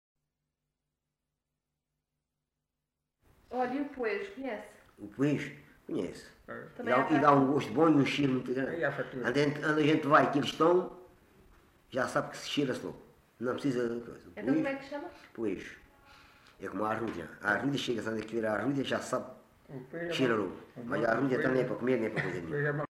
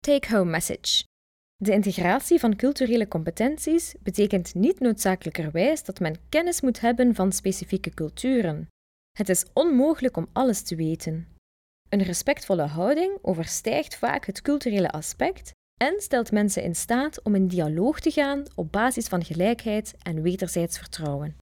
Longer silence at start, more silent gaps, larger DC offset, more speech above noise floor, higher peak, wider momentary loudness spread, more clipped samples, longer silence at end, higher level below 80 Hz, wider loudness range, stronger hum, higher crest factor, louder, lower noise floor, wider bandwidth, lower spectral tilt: first, 3.5 s vs 0.05 s; second, none vs 1.06-1.59 s, 8.70-9.15 s, 11.38-11.85 s, 15.54-15.77 s; neither; second, 56 dB vs over 66 dB; about the same, -10 dBFS vs -8 dBFS; first, 18 LU vs 8 LU; neither; about the same, 0.1 s vs 0.05 s; second, -68 dBFS vs -50 dBFS; first, 9 LU vs 3 LU; neither; first, 22 dB vs 16 dB; second, -31 LUFS vs -25 LUFS; about the same, -87 dBFS vs under -90 dBFS; second, 13 kHz vs 19 kHz; first, -6 dB/octave vs -4.5 dB/octave